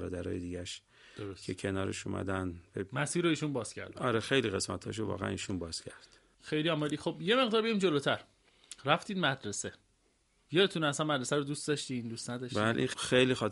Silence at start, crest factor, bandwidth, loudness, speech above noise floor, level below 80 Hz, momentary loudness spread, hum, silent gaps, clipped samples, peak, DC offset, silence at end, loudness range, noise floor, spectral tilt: 0 s; 24 dB; 11.5 kHz; -33 LUFS; 39 dB; -64 dBFS; 13 LU; none; none; under 0.1%; -10 dBFS; under 0.1%; 0 s; 4 LU; -72 dBFS; -4.5 dB/octave